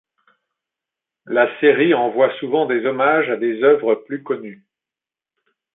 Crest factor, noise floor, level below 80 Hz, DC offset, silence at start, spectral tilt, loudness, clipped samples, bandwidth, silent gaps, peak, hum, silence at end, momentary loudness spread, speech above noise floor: 18 dB; -89 dBFS; -72 dBFS; under 0.1%; 1.25 s; -10 dB/octave; -17 LUFS; under 0.1%; 4 kHz; none; -2 dBFS; none; 1.2 s; 11 LU; 72 dB